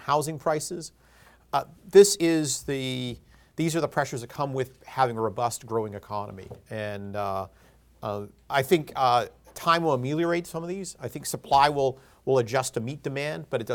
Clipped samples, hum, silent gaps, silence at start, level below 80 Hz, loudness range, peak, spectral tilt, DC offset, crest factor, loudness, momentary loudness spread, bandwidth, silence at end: under 0.1%; none; none; 0 s; -58 dBFS; 6 LU; -4 dBFS; -4.5 dB/octave; under 0.1%; 22 dB; -26 LUFS; 15 LU; 19 kHz; 0 s